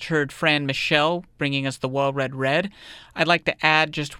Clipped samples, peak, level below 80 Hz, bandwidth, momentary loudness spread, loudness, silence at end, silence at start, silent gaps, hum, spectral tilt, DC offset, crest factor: under 0.1%; -2 dBFS; -56 dBFS; 15.5 kHz; 7 LU; -22 LUFS; 0 s; 0 s; none; none; -5 dB/octave; under 0.1%; 22 dB